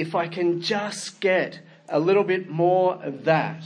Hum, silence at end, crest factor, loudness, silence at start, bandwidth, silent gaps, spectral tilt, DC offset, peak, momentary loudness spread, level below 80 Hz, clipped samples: none; 0 s; 18 dB; -23 LUFS; 0 s; 10.5 kHz; none; -5.5 dB/octave; under 0.1%; -6 dBFS; 7 LU; -76 dBFS; under 0.1%